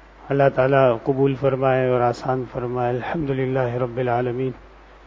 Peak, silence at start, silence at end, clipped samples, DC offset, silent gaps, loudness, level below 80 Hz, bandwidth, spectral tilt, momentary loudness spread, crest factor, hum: -2 dBFS; 0.2 s; 0.4 s; under 0.1%; under 0.1%; none; -21 LUFS; -48 dBFS; 7.6 kHz; -8.5 dB/octave; 9 LU; 18 dB; none